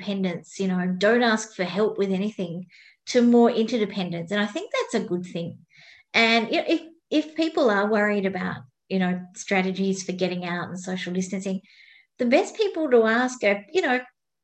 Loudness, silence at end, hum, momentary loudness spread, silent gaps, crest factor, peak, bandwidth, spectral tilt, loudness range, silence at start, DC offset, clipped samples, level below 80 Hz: -24 LUFS; 0.35 s; none; 12 LU; none; 18 dB; -6 dBFS; 8.8 kHz; -5 dB/octave; 4 LU; 0 s; under 0.1%; under 0.1%; -70 dBFS